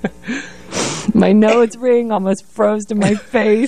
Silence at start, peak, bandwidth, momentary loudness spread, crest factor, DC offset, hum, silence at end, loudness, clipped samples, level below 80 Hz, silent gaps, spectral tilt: 0.05 s; -2 dBFS; 11 kHz; 14 LU; 14 dB; 1%; none; 0 s; -15 LUFS; under 0.1%; -48 dBFS; none; -5.5 dB/octave